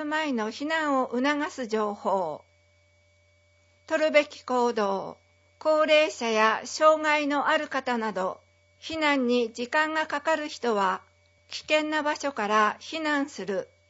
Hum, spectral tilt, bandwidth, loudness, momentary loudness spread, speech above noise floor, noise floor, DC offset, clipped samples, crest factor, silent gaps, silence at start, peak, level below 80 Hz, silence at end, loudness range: none; -3.5 dB/octave; 8 kHz; -26 LUFS; 11 LU; 37 dB; -63 dBFS; under 0.1%; under 0.1%; 20 dB; none; 0 s; -6 dBFS; -74 dBFS; 0.25 s; 5 LU